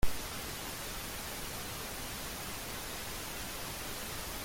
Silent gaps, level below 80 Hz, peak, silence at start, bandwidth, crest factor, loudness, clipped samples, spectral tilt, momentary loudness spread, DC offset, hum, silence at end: none; -48 dBFS; -16 dBFS; 0 s; 17 kHz; 20 dB; -40 LUFS; under 0.1%; -2.5 dB/octave; 0 LU; under 0.1%; none; 0 s